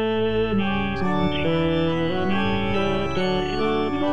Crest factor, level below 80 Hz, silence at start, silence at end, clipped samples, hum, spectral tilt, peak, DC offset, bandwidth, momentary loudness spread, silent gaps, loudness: 12 dB; -40 dBFS; 0 s; 0 s; under 0.1%; none; -7 dB/octave; -10 dBFS; 2%; 9.4 kHz; 2 LU; none; -23 LUFS